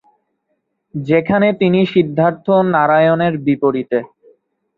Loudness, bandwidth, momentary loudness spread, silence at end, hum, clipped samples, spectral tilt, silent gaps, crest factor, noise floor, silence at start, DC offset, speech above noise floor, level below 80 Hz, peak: -15 LUFS; 5.2 kHz; 8 LU; 0.7 s; none; under 0.1%; -9.5 dB/octave; none; 14 dB; -69 dBFS; 0.95 s; under 0.1%; 55 dB; -56 dBFS; -2 dBFS